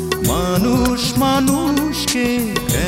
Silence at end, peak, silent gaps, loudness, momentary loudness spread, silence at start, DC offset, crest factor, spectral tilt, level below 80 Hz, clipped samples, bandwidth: 0 s; -2 dBFS; none; -17 LUFS; 3 LU; 0 s; under 0.1%; 14 dB; -4.5 dB/octave; -32 dBFS; under 0.1%; 16.5 kHz